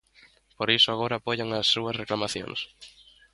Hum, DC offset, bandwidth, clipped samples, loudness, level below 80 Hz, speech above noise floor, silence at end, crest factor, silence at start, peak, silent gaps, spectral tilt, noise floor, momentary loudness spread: none; under 0.1%; 11.5 kHz; under 0.1%; -25 LUFS; -62 dBFS; 31 dB; 0.45 s; 22 dB; 0.6 s; -6 dBFS; none; -3.5 dB/octave; -59 dBFS; 13 LU